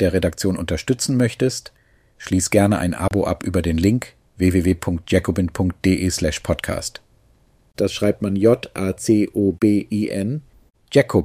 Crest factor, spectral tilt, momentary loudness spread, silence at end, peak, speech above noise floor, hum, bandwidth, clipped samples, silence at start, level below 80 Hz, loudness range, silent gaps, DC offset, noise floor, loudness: 18 dB; -6 dB/octave; 7 LU; 0 s; 0 dBFS; 37 dB; none; 15.5 kHz; under 0.1%; 0 s; -40 dBFS; 2 LU; none; under 0.1%; -56 dBFS; -20 LUFS